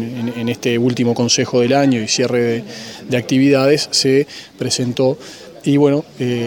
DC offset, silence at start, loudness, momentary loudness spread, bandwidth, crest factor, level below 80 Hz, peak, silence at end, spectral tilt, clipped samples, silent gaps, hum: under 0.1%; 0 s; -16 LUFS; 11 LU; 17 kHz; 16 dB; -58 dBFS; 0 dBFS; 0 s; -4.5 dB/octave; under 0.1%; none; none